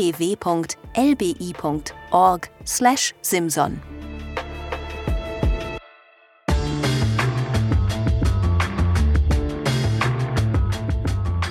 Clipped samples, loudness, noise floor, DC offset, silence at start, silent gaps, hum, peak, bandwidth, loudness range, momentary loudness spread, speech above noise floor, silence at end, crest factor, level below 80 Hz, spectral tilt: under 0.1%; -22 LUFS; -53 dBFS; under 0.1%; 0 s; none; none; -4 dBFS; 18 kHz; 5 LU; 12 LU; 32 dB; 0 s; 18 dB; -28 dBFS; -5.5 dB/octave